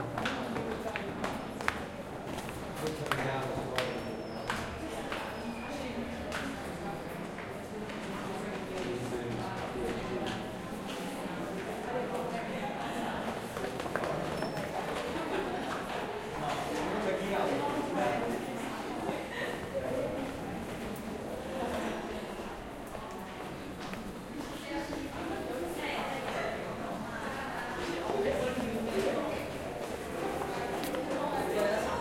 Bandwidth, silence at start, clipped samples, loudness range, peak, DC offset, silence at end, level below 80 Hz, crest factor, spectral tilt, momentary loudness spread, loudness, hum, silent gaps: 16.5 kHz; 0 s; under 0.1%; 5 LU; -8 dBFS; under 0.1%; 0 s; -56 dBFS; 28 dB; -5 dB/octave; 8 LU; -36 LUFS; none; none